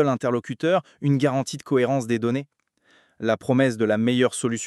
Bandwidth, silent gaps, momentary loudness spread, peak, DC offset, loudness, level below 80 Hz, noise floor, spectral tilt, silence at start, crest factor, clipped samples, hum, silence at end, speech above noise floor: 12.5 kHz; none; 6 LU; -6 dBFS; under 0.1%; -23 LUFS; -70 dBFS; -61 dBFS; -6 dB/octave; 0 s; 16 dB; under 0.1%; none; 0 s; 39 dB